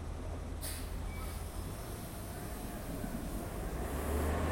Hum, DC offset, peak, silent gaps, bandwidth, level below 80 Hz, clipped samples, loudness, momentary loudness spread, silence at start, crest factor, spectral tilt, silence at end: none; under 0.1%; -24 dBFS; none; 16.5 kHz; -44 dBFS; under 0.1%; -41 LUFS; 8 LU; 0 s; 14 dB; -5.5 dB/octave; 0 s